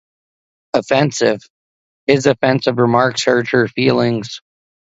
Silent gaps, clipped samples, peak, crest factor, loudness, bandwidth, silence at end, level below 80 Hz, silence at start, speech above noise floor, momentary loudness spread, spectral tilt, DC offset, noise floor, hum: 1.50-2.07 s; under 0.1%; 0 dBFS; 16 dB; -16 LUFS; 8 kHz; 0.55 s; -56 dBFS; 0.75 s; over 75 dB; 10 LU; -5 dB/octave; under 0.1%; under -90 dBFS; none